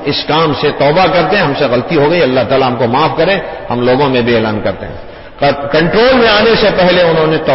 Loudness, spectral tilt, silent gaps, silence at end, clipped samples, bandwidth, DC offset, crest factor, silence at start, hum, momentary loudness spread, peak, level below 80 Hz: -10 LUFS; -9 dB/octave; none; 0 s; under 0.1%; 5.8 kHz; under 0.1%; 10 dB; 0 s; none; 8 LU; 0 dBFS; -34 dBFS